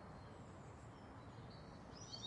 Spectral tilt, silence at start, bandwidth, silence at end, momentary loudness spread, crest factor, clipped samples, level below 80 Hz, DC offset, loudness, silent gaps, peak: -4.5 dB/octave; 0 s; 11 kHz; 0 s; 2 LU; 16 dB; under 0.1%; -68 dBFS; under 0.1%; -57 LUFS; none; -40 dBFS